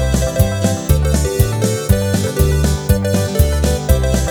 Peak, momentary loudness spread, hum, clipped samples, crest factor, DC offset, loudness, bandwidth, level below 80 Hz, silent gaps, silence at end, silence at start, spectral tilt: 0 dBFS; 2 LU; none; under 0.1%; 14 dB; under 0.1%; -16 LUFS; over 20 kHz; -18 dBFS; none; 0 s; 0 s; -5.5 dB/octave